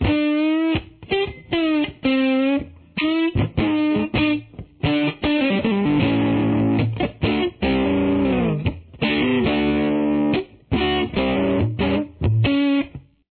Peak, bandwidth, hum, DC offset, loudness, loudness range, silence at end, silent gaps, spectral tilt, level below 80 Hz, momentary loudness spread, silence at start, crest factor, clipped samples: -6 dBFS; 4.5 kHz; none; under 0.1%; -21 LUFS; 1 LU; 0.3 s; none; -10.5 dB/octave; -38 dBFS; 6 LU; 0 s; 14 dB; under 0.1%